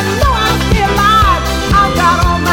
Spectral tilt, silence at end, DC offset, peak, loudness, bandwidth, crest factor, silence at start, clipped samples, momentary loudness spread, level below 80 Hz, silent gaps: -4.5 dB/octave; 0 s; 0.9%; 0 dBFS; -11 LUFS; 18 kHz; 10 dB; 0 s; under 0.1%; 4 LU; -18 dBFS; none